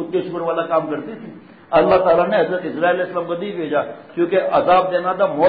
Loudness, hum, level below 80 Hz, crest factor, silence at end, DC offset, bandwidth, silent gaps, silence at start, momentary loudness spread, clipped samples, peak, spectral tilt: -18 LUFS; none; -54 dBFS; 14 dB; 0 s; 0.1%; 5 kHz; none; 0 s; 12 LU; under 0.1%; -4 dBFS; -11 dB/octave